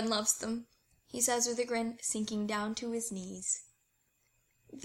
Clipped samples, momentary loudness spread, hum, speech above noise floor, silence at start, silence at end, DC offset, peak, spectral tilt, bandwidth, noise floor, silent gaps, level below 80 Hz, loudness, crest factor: under 0.1%; 9 LU; none; 41 dB; 0 s; 0 s; under 0.1%; -14 dBFS; -2.5 dB/octave; 16.5 kHz; -76 dBFS; none; -70 dBFS; -34 LUFS; 22 dB